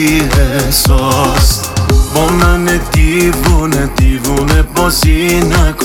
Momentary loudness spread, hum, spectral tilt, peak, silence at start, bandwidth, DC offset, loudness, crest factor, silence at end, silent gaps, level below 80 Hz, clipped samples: 3 LU; none; -4.5 dB/octave; 0 dBFS; 0 s; 18 kHz; under 0.1%; -11 LUFS; 10 dB; 0 s; none; -14 dBFS; under 0.1%